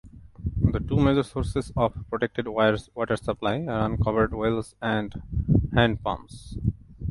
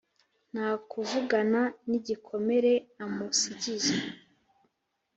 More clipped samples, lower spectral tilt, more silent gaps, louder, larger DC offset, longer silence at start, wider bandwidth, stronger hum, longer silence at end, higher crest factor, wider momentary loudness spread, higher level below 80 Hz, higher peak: neither; first, -7.5 dB/octave vs -3 dB/octave; neither; first, -26 LUFS vs -29 LUFS; neither; second, 0.05 s vs 0.55 s; first, 11.5 kHz vs 8.2 kHz; neither; second, 0 s vs 1 s; about the same, 22 dB vs 18 dB; about the same, 9 LU vs 10 LU; first, -36 dBFS vs -74 dBFS; first, -4 dBFS vs -12 dBFS